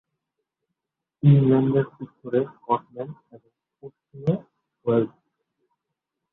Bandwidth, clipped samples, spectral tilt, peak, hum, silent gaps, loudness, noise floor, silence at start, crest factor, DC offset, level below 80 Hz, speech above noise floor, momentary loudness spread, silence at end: 3.9 kHz; under 0.1%; -12 dB/octave; -6 dBFS; none; none; -23 LUFS; -84 dBFS; 1.25 s; 20 dB; under 0.1%; -60 dBFS; 62 dB; 18 LU; 1.25 s